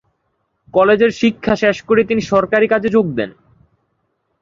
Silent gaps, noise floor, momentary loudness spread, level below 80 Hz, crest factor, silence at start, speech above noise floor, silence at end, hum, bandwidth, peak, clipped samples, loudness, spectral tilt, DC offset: none; -68 dBFS; 7 LU; -48 dBFS; 16 dB; 0.75 s; 54 dB; 1.1 s; none; 7.4 kHz; 0 dBFS; under 0.1%; -15 LUFS; -6 dB/octave; under 0.1%